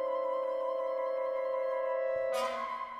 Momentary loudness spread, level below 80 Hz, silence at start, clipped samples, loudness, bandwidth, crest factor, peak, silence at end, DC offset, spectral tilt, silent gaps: 1 LU; -74 dBFS; 0 s; under 0.1%; -34 LUFS; 14 kHz; 12 dB; -22 dBFS; 0 s; under 0.1%; -2.5 dB/octave; none